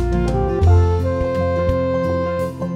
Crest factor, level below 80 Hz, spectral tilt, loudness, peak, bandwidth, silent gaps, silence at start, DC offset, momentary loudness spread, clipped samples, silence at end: 12 dB; -26 dBFS; -8.5 dB/octave; -18 LUFS; -4 dBFS; 7.8 kHz; none; 0 s; under 0.1%; 6 LU; under 0.1%; 0 s